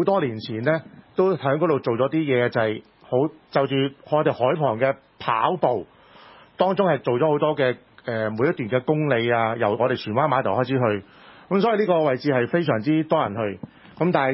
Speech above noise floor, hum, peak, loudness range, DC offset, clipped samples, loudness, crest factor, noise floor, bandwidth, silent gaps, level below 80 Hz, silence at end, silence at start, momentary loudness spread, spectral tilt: 27 dB; none; -4 dBFS; 1 LU; under 0.1%; under 0.1%; -22 LUFS; 18 dB; -49 dBFS; 5.8 kHz; none; -62 dBFS; 0 s; 0 s; 6 LU; -11 dB/octave